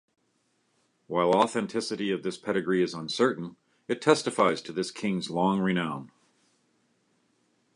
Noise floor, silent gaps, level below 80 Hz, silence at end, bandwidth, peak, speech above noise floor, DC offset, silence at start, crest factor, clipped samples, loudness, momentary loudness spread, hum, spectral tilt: -72 dBFS; none; -70 dBFS; 1.7 s; 11 kHz; -6 dBFS; 45 dB; under 0.1%; 1.1 s; 24 dB; under 0.1%; -27 LUFS; 10 LU; none; -5 dB/octave